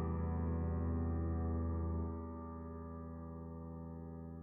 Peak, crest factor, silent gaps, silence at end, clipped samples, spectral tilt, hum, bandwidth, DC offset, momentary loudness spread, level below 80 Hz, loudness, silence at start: -28 dBFS; 12 dB; none; 0 s; under 0.1%; -9 dB/octave; none; 2.5 kHz; under 0.1%; 10 LU; -46 dBFS; -42 LUFS; 0 s